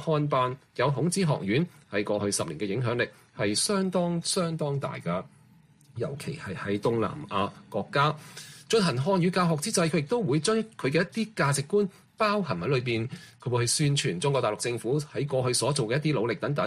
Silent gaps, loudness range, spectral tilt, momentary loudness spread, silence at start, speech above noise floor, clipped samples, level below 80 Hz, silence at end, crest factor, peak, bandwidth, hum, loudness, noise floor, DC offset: none; 4 LU; -5 dB/octave; 8 LU; 0 s; 30 dB; under 0.1%; -62 dBFS; 0 s; 16 dB; -12 dBFS; 15 kHz; none; -28 LUFS; -58 dBFS; under 0.1%